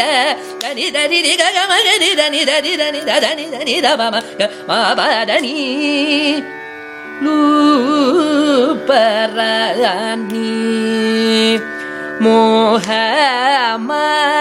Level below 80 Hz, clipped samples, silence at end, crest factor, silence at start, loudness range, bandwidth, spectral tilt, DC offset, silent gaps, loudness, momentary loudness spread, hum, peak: -64 dBFS; under 0.1%; 0 s; 14 dB; 0 s; 2 LU; 15.5 kHz; -2.5 dB/octave; under 0.1%; none; -13 LUFS; 8 LU; none; 0 dBFS